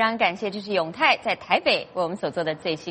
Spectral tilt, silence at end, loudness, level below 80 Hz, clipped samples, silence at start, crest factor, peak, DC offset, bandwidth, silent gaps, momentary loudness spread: -4.5 dB/octave; 0 s; -24 LUFS; -64 dBFS; under 0.1%; 0 s; 20 dB; -4 dBFS; under 0.1%; 8.8 kHz; none; 7 LU